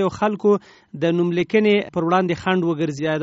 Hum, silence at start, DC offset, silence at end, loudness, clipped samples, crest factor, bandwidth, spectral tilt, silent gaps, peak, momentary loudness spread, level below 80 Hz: none; 0 s; under 0.1%; 0 s; -20 LUFS; under 0.1%; 16 dB; 8 kHz; -5.5 dB/octave; none; -4 dBFS; 5 LU; -58 dBFS